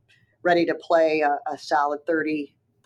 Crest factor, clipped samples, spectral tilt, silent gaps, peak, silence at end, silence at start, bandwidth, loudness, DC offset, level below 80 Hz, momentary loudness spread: 16 dB; under 0.1%; -5.5 dB/octave; none; -8 dBFS; 0.4 s; 0.45 s; 10.5 kHz; -23 LUFS; under 0.1%; -76 dBFS; 8 LU